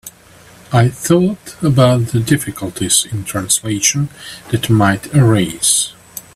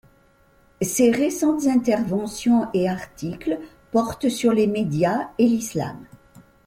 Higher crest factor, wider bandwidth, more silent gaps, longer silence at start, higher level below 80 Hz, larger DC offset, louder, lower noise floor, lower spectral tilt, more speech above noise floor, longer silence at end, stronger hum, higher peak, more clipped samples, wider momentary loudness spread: about the same, 16 dB vs 16 dB; about the same, 15.5 kHz vs 16.5 kHz; neither; second, 0.05 s vs 0.8 s; first, -46 dBFS vs -54 dBFS; neither; first, -14 LUFS vs -22 LUFS; second, -43 dBFS vs -57 dBFS; about the same, -4.5 dB/octave vs -5.5 dB/octave; second, 28 dB vs 36 dB; second, 0.15 s vs 0.65 s; neither; first, 0 dBFS vs -6 dBFS; neither; about the same, 10 LU vs 10 LU